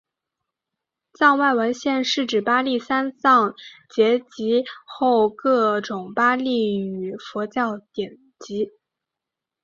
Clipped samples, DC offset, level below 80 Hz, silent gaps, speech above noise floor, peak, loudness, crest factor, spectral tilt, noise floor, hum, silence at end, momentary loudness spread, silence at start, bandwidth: under 0.1%; under 0.1%; -68 dBFS; none; 65 dB; -2 dBFS; -21 LUFS; 20 dB; -4.5 dB/octave; -86 dBFS; none; 0.95 s; 13 LU; 1.2 s; 7.6 kHz